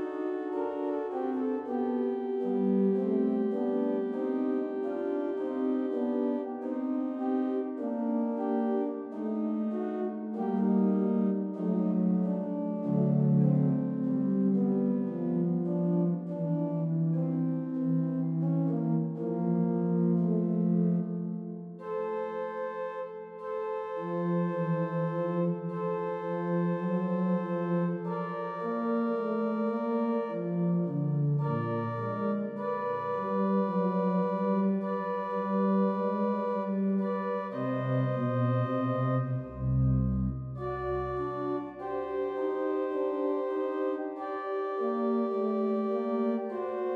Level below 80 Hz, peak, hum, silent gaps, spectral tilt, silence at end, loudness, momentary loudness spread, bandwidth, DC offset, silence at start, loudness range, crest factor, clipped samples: -54 dBFS; -16 dBFS; none; none; -11 dB/octave; 0 s; -30 LUFS; 7 LU; 4.3 kHz; under 0.1%; 0 s; 4 LU; 14 dB; under 0.1%